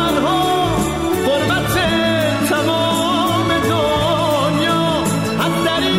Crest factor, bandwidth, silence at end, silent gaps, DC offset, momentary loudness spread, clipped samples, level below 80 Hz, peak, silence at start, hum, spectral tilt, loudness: 10 dB; 16.5 kHz; 0 s; none; 0.4%; 2 LU; under 0.1%; -38 dBFS; -6 dBFS; 0 s; none; -4.5 dB/octave; -16 LUFS